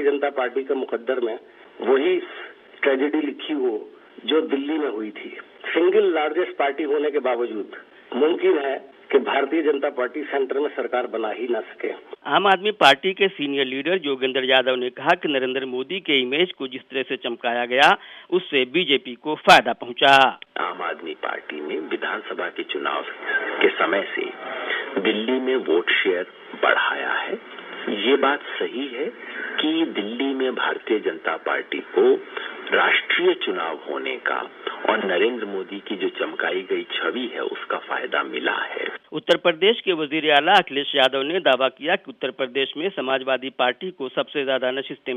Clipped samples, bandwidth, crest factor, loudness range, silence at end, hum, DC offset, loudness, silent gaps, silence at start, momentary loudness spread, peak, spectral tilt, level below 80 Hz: under 0.1%; 12.5 kHz; 20 dB; 5 LU; 0 s; none; under 0.1%; -22 LUFS; none; 0 s; 12 LU; -2 dBFS; -4 dB/octave; -72 dBFS